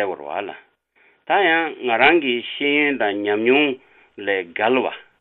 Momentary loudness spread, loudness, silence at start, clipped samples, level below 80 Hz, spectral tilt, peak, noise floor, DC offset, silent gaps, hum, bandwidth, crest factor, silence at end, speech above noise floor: 14 LU; -19 LUFS; 0 s; under 0.1%; -68 dBFS; -8 dB/octave; -2 dBFS; -59 dBFS; under 0.1%; none; none; 4.3 kHz; 18 dB; 0.2 s; 39 dB